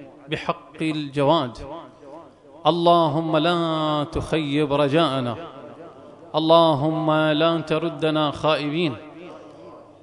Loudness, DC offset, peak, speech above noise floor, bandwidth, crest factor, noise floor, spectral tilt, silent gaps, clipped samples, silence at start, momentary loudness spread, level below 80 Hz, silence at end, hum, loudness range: -21 LUFS; under 0.1%; -2 dBFS; 24 dB; 11 kHz; 20 dB; -44 dBFS; -7 dB/octave; none; under 0.1%; 0 s; 21 LU; -50 dBFS; 0.2 s; none; 2 LU